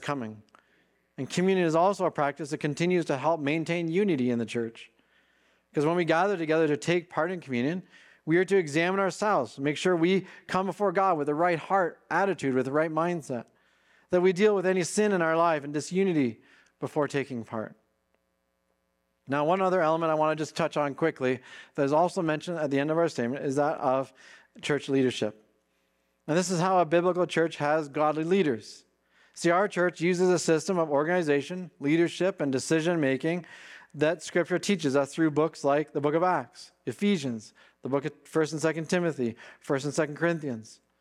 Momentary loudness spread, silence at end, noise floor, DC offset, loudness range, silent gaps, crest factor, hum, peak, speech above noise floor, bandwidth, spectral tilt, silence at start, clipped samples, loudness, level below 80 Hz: 10 LU; 0.25 s; -76 dBFS; under 0.1%; 3 LU; none; 16 dB; none; -12 dBFS; 49 dB; 13 kHz; -5.5 dB/octave; 0 s; under 0.1%; -27 LUFS; -76 dBFS